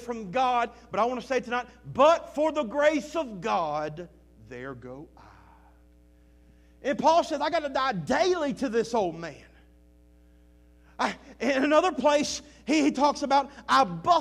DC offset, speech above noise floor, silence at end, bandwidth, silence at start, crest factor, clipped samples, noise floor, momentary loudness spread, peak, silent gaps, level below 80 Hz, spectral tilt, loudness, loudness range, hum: under 0.1%; 31 dB; 0 s; 12.5 kHz; 0 s; 20 dB; under 0.1%; -57 dBFS; 17 LU; -8 dBFS; none; -58 dBFS; -4 dB/octave; -26 LUFS; 8 LU; none